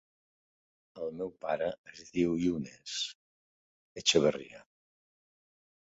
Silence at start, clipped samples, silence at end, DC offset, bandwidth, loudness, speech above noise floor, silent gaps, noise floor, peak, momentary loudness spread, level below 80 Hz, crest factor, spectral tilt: 0.95 s; under 0.1%; 1.3 s; under 0.1%; 8 kHz; -32 LUFS; over 58 dB; 1.78-1.84 s, 3.15-3.96 s; under -90 dBFS; -12 dBFS; 17 LU; -66 dBFS; 24 dB; -3.5 dB/octave